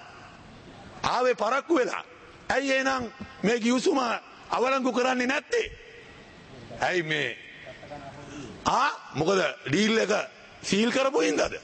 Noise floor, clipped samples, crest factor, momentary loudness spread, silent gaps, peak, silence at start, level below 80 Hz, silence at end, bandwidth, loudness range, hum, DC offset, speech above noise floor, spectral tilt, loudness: -48 dBFS; under 0.1%; 16 dB; 22 LU; none; -10 dBFS; 0 s; -58 dBFS; 0 s; 8.8 kHz; 4 LU; none; under 0.1%; 22 dB; -4 dB/octave; -26 LUFS